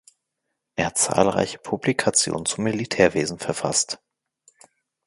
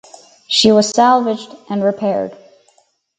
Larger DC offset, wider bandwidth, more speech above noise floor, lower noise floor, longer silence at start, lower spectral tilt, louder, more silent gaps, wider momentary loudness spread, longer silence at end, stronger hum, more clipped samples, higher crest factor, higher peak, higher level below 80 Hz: neither; first, 12 kHz vs 9.4 kHz; first, 57 dB vs 43 dB; first, -80 dBFS vs -57 dBFS; first, 0.75 s vs 0.5 s; about the same, -3 dB/octave vs -4 dB/octave; second, -22 LUFS vs -14 LUFS; neither; second, 8 LU vs 13 LU; first, 1.1 s vs 0.85 s; neither; neither; first, 24 dB vs 16 dB; about the same, 0 dBFS vs 0 dBFS; first, -54 dBFS vs -60 dBFS